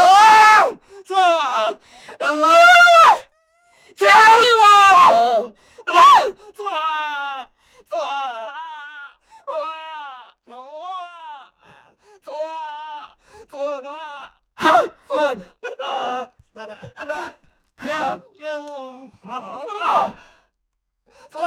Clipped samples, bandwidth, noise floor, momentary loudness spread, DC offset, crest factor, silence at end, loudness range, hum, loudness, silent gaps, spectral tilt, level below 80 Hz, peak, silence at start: under 0.1%; 18 kHz; -74 dBFS; 25 LU; under 0.1%; 16 dB; 0 s; 21 LU; none; -13 LUFS; none; -1.5 dB/octave; -62 dBFS; 0 dBFS; 0 s